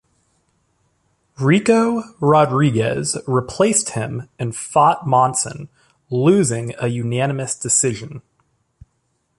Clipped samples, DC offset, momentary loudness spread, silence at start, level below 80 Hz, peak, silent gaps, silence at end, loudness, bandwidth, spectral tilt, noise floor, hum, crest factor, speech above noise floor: under 0.1%; under 0.1%; 12 LU; 1.4 s; -54 dBFS; -2 dBFS; none; 1.2 s; -18 LUFS; 11.5 kHz; -5 dB/octave; -68 dBFS; none; 16 dB; 50 dB